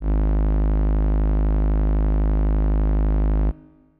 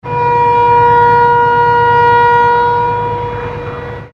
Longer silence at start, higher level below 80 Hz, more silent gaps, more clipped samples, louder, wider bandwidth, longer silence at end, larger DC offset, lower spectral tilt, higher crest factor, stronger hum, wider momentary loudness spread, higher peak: about the same, 0 s vs 0.05 s; first, -20 dBFS vs -36 dBFS; neither; neither; second, -22 LUFS vs -9 LUFS; second, 2.7 kHz vs 6.6 kHz; first, 0.45 s vs 0.05 s; neither; first, -12.5 dB/octave vs -7 dB/octave; second, 4 dB vs 10 dB; first, 50 Hz at -60 dBFS vs none; second, 1 LU vs 13 LU; second, -16 dBFS vs 0 dBFS